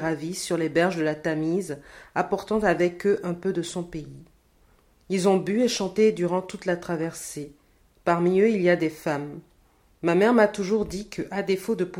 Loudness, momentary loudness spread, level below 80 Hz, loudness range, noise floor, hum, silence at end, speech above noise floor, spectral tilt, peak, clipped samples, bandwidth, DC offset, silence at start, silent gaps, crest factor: -25 LUFS; 14 LU; -56 dBFS; 3 LU; -60 dBFS; none; 0 s; 36 dB; -5.5 dB/octave; -6 dBFS; under 0.1%; 16.5 kHz; under 0.1%; 0 s; none; 20 dB